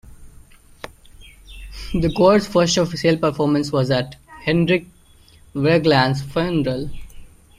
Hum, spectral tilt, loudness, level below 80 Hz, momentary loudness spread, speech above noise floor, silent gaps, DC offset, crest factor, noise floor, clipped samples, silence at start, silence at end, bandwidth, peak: none; -5.5 dB/octave; -19 LUFS; -40 dBFS; 20 LU; 32 dB; none; under 0.1%; 18 dB; -49 dBFS; under 0.1%; 0.05 s; 0.3 s; 14.5 kHz; -2 dBFS